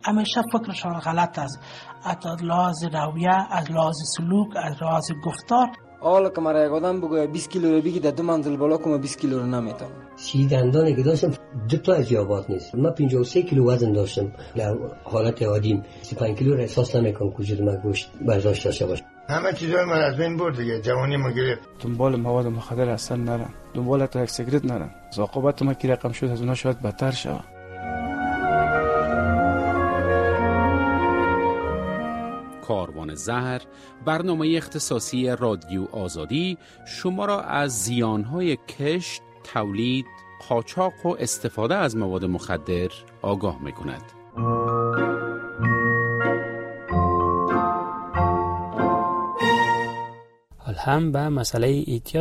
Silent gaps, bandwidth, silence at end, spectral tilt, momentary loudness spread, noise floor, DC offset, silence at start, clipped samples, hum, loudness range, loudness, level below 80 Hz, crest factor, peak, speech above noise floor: none; 14.5 kHz; 0 s; -6 dB/octave; 10 LU; -48 dBFS; under 0.1%; 0.05 s; under 0.1%; none; 4 LU; -24 LUFS; -46 dBFS; 16 dB; -8 dBFS; 24 dB